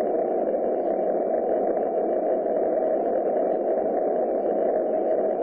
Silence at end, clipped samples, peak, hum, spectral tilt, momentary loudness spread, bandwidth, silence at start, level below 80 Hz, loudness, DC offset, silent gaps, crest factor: 0 s; under 0.1%; -14 dBFS; none; -11.5 dB/octave; 1 LU; 3.1 kHz; 0 s; -64 dBFS; -24 LUFS; under 0.1%; none; 10 dB